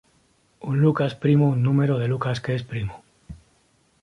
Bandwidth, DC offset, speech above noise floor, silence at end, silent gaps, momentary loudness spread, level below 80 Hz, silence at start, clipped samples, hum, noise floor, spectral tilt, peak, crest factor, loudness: 9.4 kHz; under 0.1%; 42 dB; 0.7 s; none; 12 LU; -52 dBFS; 0.65 s; under 0.1%; none; -63 dBFS; -8.5 dB/octave; -8 dBFS; 16 dB; -22 LUFS